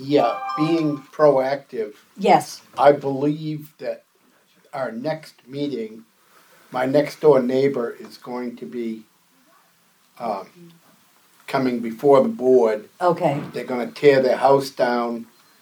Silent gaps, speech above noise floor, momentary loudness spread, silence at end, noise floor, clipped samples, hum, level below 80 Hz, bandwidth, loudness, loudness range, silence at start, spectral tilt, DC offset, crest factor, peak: none; 39 dB; 15 LU; 0.4 s; -59 dBFS; under 0.1%; none; -78 dBFS; 20 kHz; -21 LUFS; 12 LU; 0 s; -6.5 dB/octave; under 0.1%; 20 dB; -2 dBFS